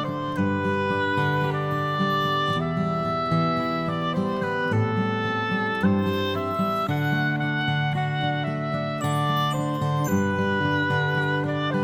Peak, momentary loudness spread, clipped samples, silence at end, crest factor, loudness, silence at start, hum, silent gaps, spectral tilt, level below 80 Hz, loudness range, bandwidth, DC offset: -10 dBFS; 3 LU; under 0.1%; 0 s; 14 dB; -24 LUFS; 0 s; none; none; -6.5 dB/octave; -56 dBFS; 1 LU; 16.5 kHz; under 0.1%